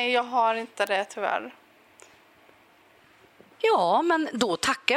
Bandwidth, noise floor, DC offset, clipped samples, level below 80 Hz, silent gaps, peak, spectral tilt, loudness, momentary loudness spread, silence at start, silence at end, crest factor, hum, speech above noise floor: 16 kHz; -58 dBFS; under 0.1%; under 0.1%; -68 dBFS; none; -6 dBFS; -3 dB/octave; -25 LUFS; 7 LU; 0 s; 0 s; 22 dB; none; 33 dB